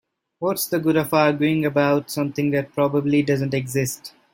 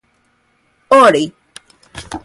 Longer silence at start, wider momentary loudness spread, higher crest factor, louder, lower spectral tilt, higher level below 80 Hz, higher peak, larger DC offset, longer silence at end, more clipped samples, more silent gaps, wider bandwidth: second, 0.4 s vs 0.9 s; second, 7 LU vs 25 LU; about the same, 18 dB vs 16 dB; second, -21 LUFS vs -11 LUFS; first, -5.5 dB/octave vs -4 dB/octave; second, -60 dBFS vs -50 dBFS; second, -4 dBFS vs 0 dBFS; neither; first, 0.25 s vs 0.05 s; neither; neither; first, 16.5 kHz vs 11.5 kHz